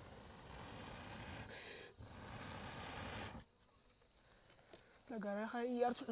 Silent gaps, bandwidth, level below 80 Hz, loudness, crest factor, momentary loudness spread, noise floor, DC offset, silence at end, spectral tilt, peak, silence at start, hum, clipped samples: none; 4 kHz; -66 dBFS; -48 LUFS; 22 dB; 19 LU; -72 dBFS; under 0.1%; 0 s; -4.5 dB/octave; -26 dBFS; 0 s; none; under 0.1%